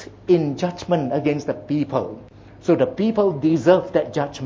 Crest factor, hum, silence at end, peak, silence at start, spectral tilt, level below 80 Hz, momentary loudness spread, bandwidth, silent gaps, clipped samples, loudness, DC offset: 18 dB; none; 0 s; -2 dBFS; 0 s; -7.5 dB/octave; -54 dBFS; 9 LU; 7.6 kHz; none; under 0.1%; -21 LUFS; under 0.1%